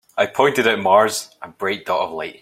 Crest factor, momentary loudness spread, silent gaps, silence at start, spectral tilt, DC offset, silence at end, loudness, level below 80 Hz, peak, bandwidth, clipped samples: 18 dB; 12 LU; none; 0.15 s; -3 dB/octave; under 0.1%; 0.1 s; -18 LUFS; -62 dBFS; 0 dBFS; 16 kHz; under 0.1%